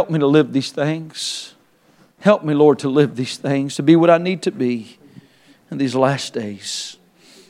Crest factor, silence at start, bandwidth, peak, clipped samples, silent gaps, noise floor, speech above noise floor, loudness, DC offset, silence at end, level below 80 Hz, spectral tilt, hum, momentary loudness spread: 18 dB; 0 s; 13 kHz; 0 dBFS; under 0.1%; none; -54 dBFS; 37 dB; -18 LUFS; under 0.1%; 0.55 s; -70 dBFS; -6 dB/octave; none; 13 LU